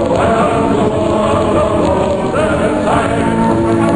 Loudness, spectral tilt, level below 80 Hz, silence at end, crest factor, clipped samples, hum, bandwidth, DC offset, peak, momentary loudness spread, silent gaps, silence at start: -13 LUFS; -6.5 dB/octave; -30 dBFS; 0 s; 12 dB; under 0.1%; none; 10.5 kHz; 0.3%; 0 dBFS; 2 LU; none; 0 s